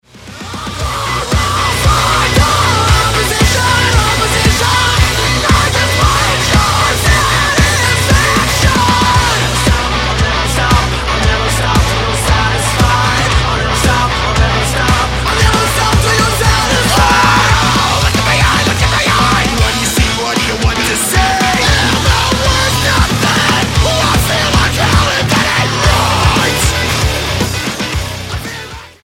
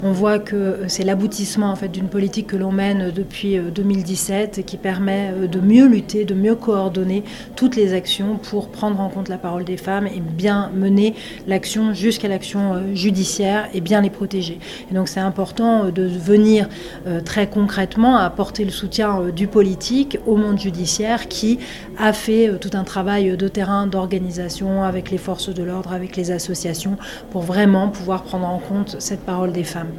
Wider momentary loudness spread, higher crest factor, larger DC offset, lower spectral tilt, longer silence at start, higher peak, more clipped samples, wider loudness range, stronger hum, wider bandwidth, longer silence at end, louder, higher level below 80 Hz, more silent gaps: second, 4 LU vs 9 LU; second, 12 dB vs 18 dB; neither; second, -3.5 dB/octave vs -5.5 dB/octave; first, 0.15 s vs 0 s; about the same, 0 dBFS vs 0 dBFS; neither; about the same, 2 LU vs 4 LU; neither; about the same, 16.5 kHz vs 15.5 kHz; first, 0.15 s vs 0 s; first, -11 LUFS vs -19 LUFS; first, -20 dBFS vs -44 dBFS; neither